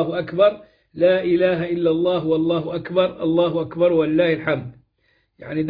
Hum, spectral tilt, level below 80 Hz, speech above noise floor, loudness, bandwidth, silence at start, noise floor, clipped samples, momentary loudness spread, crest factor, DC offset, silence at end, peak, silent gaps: none; -10 dB/octave; -56 dBFS; 46 dB; -20 LUFS; 5 kHz; 0 s; -65 dBFS; under 0.1%; 6 LU; 16 dB; under 0.1%; 0 s; -4 dBFS; none